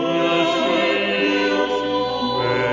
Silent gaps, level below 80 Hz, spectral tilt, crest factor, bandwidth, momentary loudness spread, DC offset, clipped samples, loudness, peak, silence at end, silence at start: none; -52 dBFS; -5 dB/octave; 14 dB; 7.6 kHz; 3 LU; under 0.1%; under 0.1%; -19 LUFS; -6 dBFS; 0 s; 0 s